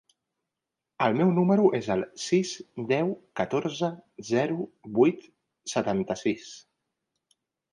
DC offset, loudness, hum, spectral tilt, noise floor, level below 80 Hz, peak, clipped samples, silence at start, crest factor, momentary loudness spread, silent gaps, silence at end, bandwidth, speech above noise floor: under 0.1%; -27 LUFS; none; -6 dB/octave; -87 dBFS; -66 dBFS; -8 dBFS; under 0.1%; 1 s; 20 dB; 14 LU; none; 1.15 s; 11 kHz; 61 dB